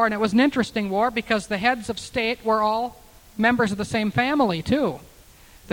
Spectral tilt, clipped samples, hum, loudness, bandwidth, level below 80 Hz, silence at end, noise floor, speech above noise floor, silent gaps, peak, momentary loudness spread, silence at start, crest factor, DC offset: -5.5 dB/octave; under 0.1%; none; -22 LUFS; 18 kHz; -50 dBFS; 0 s; -49 dBFS; 27 dB; none; -6 dBFS; 8 LU; 0 s; 18 dB; under 0.1%